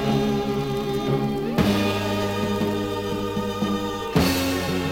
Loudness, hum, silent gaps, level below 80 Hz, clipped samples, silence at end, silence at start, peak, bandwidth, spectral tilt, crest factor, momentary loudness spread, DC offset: -24 LUFS; none; none; -44 dBFS; under 0.1%; 0 s; 0 s; -4 dBFS; 17 kHz; -5.5 dB/octave; 20 dB; 5 LU; under 0.1%